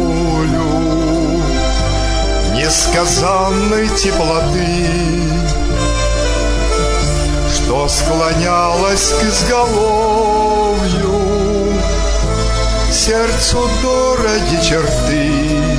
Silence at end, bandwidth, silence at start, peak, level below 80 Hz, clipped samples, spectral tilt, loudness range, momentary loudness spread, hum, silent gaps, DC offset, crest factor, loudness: 0 s; 11 kHz; 0 s; -2 dBFS; -20 dBFS; under 0.1%; -4 dB/octave; 2 LU; 4 LU; none; none; under 0.1%; 12 dB; -14 LUFS